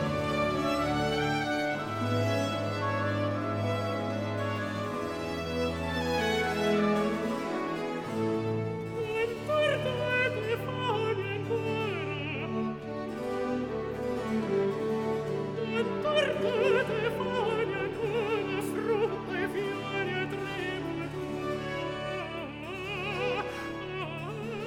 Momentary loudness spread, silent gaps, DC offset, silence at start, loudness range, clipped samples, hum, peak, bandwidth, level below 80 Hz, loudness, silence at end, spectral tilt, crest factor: 7 LU; none; under 0.1%; 0 s; 4 LU; under 0.1%; none; -14 dBFS; 17.5 kHz; -54 dBFS; -31 LUFS; 0 s; -6 dB/octave; 16 dB